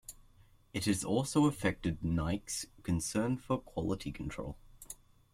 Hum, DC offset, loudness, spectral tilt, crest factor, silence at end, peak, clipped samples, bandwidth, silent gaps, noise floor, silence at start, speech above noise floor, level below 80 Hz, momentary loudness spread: none; under 0.1%; -35 LUFS; -5 dB/octave; 20 dB; 0.4 s; -16 dBFS; under 0.1%; 16 kHz; none; -62 dBFS; 0.1 s; 28 dB; -52 dBFS; 19 LU